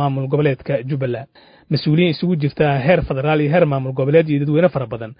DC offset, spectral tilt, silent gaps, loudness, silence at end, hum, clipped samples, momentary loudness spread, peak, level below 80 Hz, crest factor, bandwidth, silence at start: under 0.1%; -12.5 dB/octave; none; -17 LUFS; 0.05 s; none; under 0.1%; 7 LU; 0 dBFS; -44 dBFS; 16 dB; 5.2 kHz; 0 s